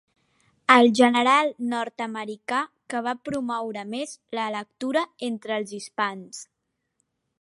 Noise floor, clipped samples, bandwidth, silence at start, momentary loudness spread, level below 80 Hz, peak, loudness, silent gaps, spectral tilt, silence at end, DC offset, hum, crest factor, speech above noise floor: -75 dBFS; under 0.1%; 11.5 kHz; 0.7 s; 15 LU; -72 dBFS; -2 dBFS; -24 LUFS; none; -3.5 dB/octave; 0.95 s; under 0.1%; none; 24 dB; 51 dB